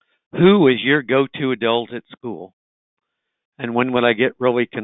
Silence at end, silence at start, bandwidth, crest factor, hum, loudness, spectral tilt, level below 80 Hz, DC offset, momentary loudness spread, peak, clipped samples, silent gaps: 0 s; 0.35 s; 4 kHz; 18 dB; none; -17 LUFS; -11 dB/octave; -62 dBFS; under 0.1%; 18 LU; -2 dBFS; under 0.1%; 2.53-2.97 s, 3.45-3.52 s